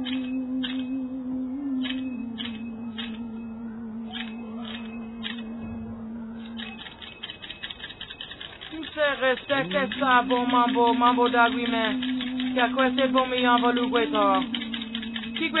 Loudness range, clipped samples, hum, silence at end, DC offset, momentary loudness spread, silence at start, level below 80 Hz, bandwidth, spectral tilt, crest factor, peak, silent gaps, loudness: 14 LU; under 0.1%; none; 0 s; under 0.1%; 16 LU; 0 s; -58 dBFS; 4.1 kHz; -7.5 dB/octave; 20 dB; -8 dBFS; none; -26 LUFS